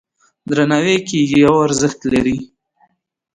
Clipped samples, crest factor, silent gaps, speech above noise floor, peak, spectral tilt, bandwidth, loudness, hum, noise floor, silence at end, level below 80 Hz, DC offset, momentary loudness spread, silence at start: under 0.1%; 16 dB; none; 45 dB; 0 dBFS; -5 dB/octave; 10.5 kHz; -15 LUFS; none; -59 dBFS; 0.9 s; -46 dBFS; under 0.1%; 9 LU; 0.45 s